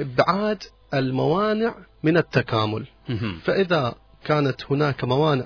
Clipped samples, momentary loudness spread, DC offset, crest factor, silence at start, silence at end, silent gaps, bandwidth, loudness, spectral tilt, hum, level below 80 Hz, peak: under 0.1%; 8 LU; under 0.1%; 20 dB; 0 s; 0 s; none; 5.4 kHz; -23 LUFS; -7.5 dB/octave; none; -52 dBFS; -2 dBFS